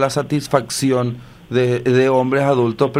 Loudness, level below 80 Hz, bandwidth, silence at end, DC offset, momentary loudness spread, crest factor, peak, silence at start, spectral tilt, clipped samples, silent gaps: -17 LUFS; -52 dBFS; 16 kHz; 0 s; under 0.1%; 7 LU; 16 dB; 0 dBFS; 0 s; -6 dB/octave; under 0.1%; none